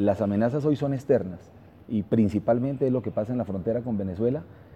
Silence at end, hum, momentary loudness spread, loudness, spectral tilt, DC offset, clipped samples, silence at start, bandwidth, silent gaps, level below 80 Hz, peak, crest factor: 0 s; none; 7 LU; -26 LUFS; -9.5 dB/octave; under 0.1%; under 0.1%; 0 s; 8.6 kHz; none; -56 dBFS; -10 dBFS; 16 dB